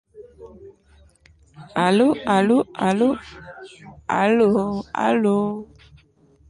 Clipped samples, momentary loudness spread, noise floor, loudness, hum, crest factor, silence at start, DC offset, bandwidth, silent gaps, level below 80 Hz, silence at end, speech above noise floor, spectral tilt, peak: under 0.1%; 22 LU; -55 dBFS; -20 LUFS; none; 16 dB; 0.15 s; under 0.1%; 11 kHz; none; -54 dBFS; 0.85 s; 36 dB; -6.5 dB/octave; -6 dBFS